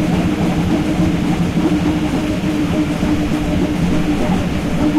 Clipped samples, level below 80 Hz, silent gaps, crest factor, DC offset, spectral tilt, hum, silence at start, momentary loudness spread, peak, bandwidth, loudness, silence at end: under 0.1%; -28 dBFS; none; 8 dB; under 0.1%; -7 dB/octave; none; 0 s; 2 LU; -8 dBFS; 15 kHz; -17 LUFS; 0 s